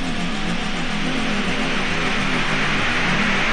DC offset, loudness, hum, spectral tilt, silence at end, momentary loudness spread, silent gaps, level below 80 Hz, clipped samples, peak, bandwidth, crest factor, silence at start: 1%; -21 LUFS; none; -4 dB/octave; 0 s; 5 LU; none; -28 dBFS; under 0.1%; -6 dBFS; 10 kHz; 14 dB; 0 s